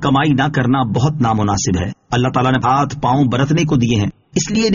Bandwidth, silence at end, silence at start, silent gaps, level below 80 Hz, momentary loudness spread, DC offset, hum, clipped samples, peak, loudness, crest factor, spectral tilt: 7.4 kHz; 0 s; 0 s; none; -40 dBFS; 5 LU; under 0.1%; none; under 0.1%; -2 dBFS; -16 LUFS; 12 dB; -5.5 dB/octave